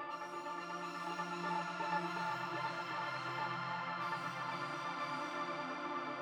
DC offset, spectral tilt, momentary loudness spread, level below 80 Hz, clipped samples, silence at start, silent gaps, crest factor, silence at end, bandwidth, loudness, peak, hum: under 0.1%; -4.5 dB/octave; 5 LU; -90 dBFS; under 0.1%; 0 s; none; 16 dB; 0 s; 19 kHz; -41 LUFS; -26 dBFS; none